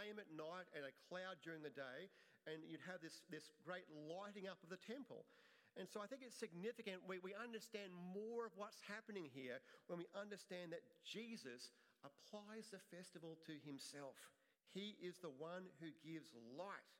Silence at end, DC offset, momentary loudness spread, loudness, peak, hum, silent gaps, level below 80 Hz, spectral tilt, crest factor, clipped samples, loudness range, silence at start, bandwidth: 0 s; under 0.1%; 8 LU; -55 LUFS; -36 dBFS; none; none; under -90 dBFS; -4.5 dB/octave; 20 dB; under 0.1%; 4 LU; 0 s; 16 kHz